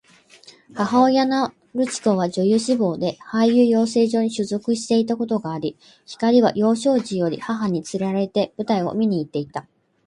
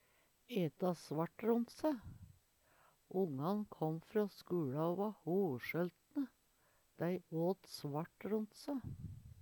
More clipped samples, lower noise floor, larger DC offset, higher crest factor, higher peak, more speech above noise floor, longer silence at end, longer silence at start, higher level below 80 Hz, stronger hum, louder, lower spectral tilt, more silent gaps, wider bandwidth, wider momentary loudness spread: neither; second, -49 dBFS vs -75 dBFS; neither; about the same, 16 dB vs 18 dB; first, -4 dBFS vs -24 dBFS; second, 29 dB vs 35 dB; first, 0.45 s vs 0 s; first, 0.75 s vs 0.5 s; first, -64 dBFS vs -72 dBFS; neither; first, -20 LUFS vs -41 LUFS; second, -6 dB/octave vs -7.5 dB/octave; neither; second, 11 kHz vs 19 kHz; about the same, 10 LU vs 8 LU